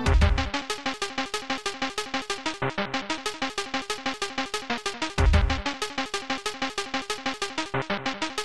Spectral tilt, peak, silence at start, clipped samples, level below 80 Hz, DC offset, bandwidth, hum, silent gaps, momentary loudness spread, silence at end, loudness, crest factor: -4 dB/octave; -8 dBFS; 0 s; under 0.1%; -32 dBFS; 0.6%; 13 kHz; none; none; 7 LU; 0 s; -28 LUFS; 20 dB